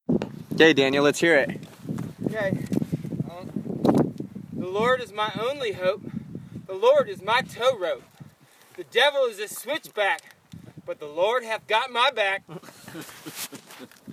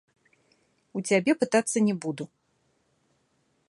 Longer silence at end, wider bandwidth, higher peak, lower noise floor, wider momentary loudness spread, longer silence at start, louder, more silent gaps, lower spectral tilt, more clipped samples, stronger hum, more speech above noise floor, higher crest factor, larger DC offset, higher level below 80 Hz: second, 0 s vs 1.4 s; first, 16 kHz vs 11.5 kHz; first, -4 dBFS vs -8 dBFS; second, -54 dBFS vs -71 dBFS; first, 18 LU vs 15 LU; second, 0.1 s vs 0.95 s; about the same, -24 LUFS vs -26 LUFS; neither; about the same, -4.5 dB/octave vs -4.5 dB/octave; neither; neither; second, 30 dB vs 46 dB; about the same, 22 dB vs 20 dB; neither; first, -62 dBFS vs -76 dBFS